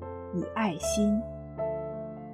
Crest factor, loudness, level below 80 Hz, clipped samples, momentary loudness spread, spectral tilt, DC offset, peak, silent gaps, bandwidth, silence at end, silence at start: 16 dB; -31 LUFS; -50 dBFS; under 0.1%; 11 LU; -5.5 dB/octave; under 0.1%; -16 dBFS; none; 14 kHz; 0 s; 0 s